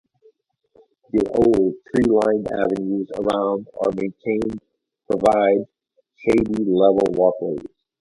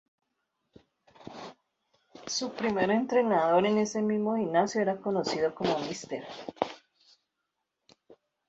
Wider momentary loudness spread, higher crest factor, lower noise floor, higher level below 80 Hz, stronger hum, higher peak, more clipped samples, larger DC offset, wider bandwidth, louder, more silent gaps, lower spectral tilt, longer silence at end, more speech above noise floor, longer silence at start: second, 10 LU vs 20 LU; second, 18 dB vs 24 dB; second, -60 dBFS vs -84 dBFS; first, -50 dBFS vs -70 dBFS; neither; first, -4 dBFS vs -8 dBFS; neither; neither; first, 11.5 kHz vs 8 kHz; first, -20 LUFS vs -29 LUFS; neither; first, -7.5 dB/octave vs -4.5 dB/octave; about the same, 0.35 s vs 0.35 s; second, 41 dB vs 56 dB; about the same, 1.15 s vs 1.2 s